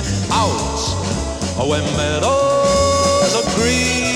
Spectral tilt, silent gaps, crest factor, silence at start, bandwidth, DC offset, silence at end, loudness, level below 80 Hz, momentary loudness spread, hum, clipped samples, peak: -4 dB/octave; none; 14 dB; 0 s; 16 kHz; under 0.1%; 0 s; -16 LUFS; -32 dBFS; 6 LU; none; under 0.1%; -2 dBFS